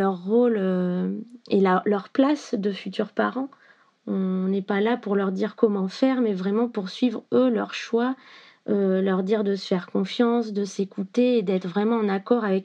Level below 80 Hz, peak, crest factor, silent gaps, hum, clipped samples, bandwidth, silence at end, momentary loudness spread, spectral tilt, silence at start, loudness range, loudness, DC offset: under -90 dBFS; -6 dBFS; 18 dB; none; none; under 0.1%; 8.4 kHz; 0 s; 7 LU; -7 dB/octave; 0 s; 2 LU; -24 LUFS; under 0.1%